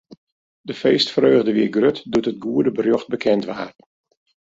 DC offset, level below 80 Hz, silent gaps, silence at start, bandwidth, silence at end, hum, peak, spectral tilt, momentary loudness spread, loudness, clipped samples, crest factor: under 0.1%; -60 dBFS; 0.17-0.64 s; 0.1 s; 7.8 kHz; 0.8 s; none; -4 dBFS; -6 dB/octave; 15 LU; -19 LUFS; under 0.1%; 16 dB